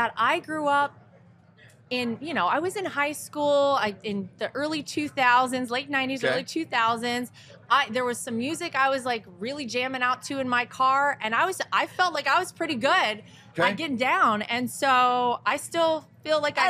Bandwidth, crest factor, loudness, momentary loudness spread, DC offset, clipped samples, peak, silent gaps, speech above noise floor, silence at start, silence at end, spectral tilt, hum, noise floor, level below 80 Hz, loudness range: 15.5 kHz; 18 dB; -25 LUFS; 8 LU; under 0.1%; under 0.1%; -8 dBFS; none; 29 dB; 0 s; 0 s; -3 dB/octave; none; -55 dBFS; -74 dBFS; 3 LU